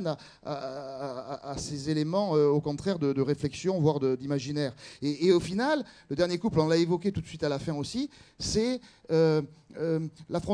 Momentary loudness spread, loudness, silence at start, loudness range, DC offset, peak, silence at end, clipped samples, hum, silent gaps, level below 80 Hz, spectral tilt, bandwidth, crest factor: 12 LU; -29 LUFS; 0 s; 2 LU; under 0.1%; -12 dBFS; 0 s; under 0.1%; none; none; -56 dBFS; -6 dB/octave; 10.5 kHz; 18 dB